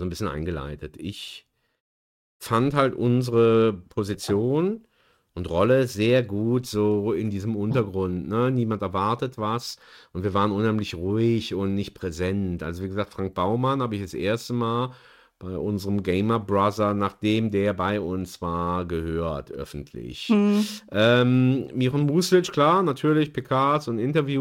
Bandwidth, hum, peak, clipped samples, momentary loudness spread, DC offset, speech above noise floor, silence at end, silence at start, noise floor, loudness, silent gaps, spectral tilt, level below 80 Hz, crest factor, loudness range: 16.5 kHz; none; -6 dBFS; under 0.1%; 13 LU; under 0.1%; 26 dB; 0 s; 0 s; -50 dBFS; -24 LUFS; 1.80-2.40 s; -6.5 dB/octave; -50 dBFS; 16 dB; 6 LU